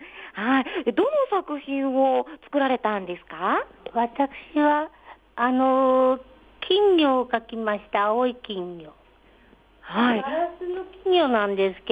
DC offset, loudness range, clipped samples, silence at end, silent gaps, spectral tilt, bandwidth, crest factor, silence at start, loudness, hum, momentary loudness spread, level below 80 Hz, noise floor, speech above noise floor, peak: under 0.1%; 5 LU; under 0.1%; 0 s; none; -7 dB/octave; 5 kHz; 16 dB; 0 s; -23 LUFS; none; 13 LU; -60 dBFS; -55 dBFS; 32 dB; -8 dBFS